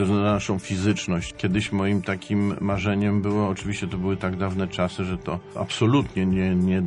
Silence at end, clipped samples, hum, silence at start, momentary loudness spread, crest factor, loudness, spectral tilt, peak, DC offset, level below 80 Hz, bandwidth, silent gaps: 0 s; under 0.1%; none; 0 s; 7 LU; 16 dB; -24 LUFS; -6.5 dB/octave; -8 dBFS; under 0.1%; -46 dBFS; 10.5 kHz; none